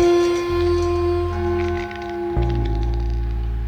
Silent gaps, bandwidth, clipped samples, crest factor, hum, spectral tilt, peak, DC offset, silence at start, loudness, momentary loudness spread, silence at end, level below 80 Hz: none; 9.2 kHz; under 0.1%; 12 dB; none; -7 dB/octave; -6 dBFS; under 0.1%; 0 s; -22 LUFS; 7 LU; 0 s; -26 dBFS